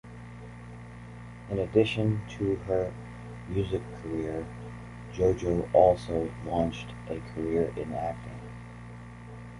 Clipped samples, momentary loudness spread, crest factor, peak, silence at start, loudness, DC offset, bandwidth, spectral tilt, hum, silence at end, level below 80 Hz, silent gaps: under 0.1%; 20 LU; 22 dB; -8 dBFS; 0.05 s; -29 LUFS; under 0.1%; 11.5 kHz; -7.5 dB/octave; none; 0 s; -48 dBFS; none